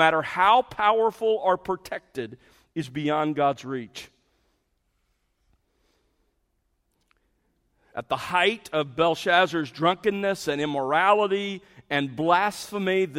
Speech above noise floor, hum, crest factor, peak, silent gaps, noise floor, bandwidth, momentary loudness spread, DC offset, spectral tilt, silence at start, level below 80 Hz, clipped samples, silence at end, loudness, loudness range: 49 dB; none; 22 dB; -4 dBFS; none; -73 dBFS; 16 kHz; 14 LU; under 0.1%; -4.5 dB/octave; 0 s; -64 dBFS; under 0.1%; 0 s; -24 LUFS; 8 LU